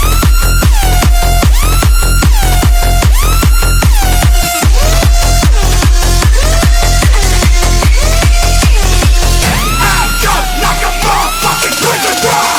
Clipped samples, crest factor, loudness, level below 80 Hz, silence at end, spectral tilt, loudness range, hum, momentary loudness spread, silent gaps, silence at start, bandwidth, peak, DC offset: 0.2%; 8 dB; -10 LUFS; -8 dBFS; 0 s; -3.5 dB/octave; 1 LU; none; 1 LU; none; 0 s; 16 kHz; 0 dBFS; under 0.1%